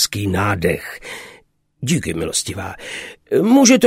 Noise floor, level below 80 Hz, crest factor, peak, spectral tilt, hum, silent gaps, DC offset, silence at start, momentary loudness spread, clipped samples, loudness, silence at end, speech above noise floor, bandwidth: -51 dBFS; -46 dBFS; 18 dB; 0 dBFS; -4 dB/octave; none; none; under 0.1%; 0 s; 17 LU; under 0.1%; -18 LUFS; 0 s; 34 dB; 16 kHz